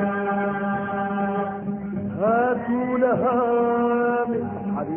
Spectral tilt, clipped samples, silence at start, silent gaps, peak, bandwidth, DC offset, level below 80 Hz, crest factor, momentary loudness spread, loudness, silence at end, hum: -12 dB/octave; under 0.1%; 0 s; none; -8 dBFS; 3.4 kHz; under 0.1%; -56 dBFS; 14 dB; 7 LU; -23 LUFS; 0 s; none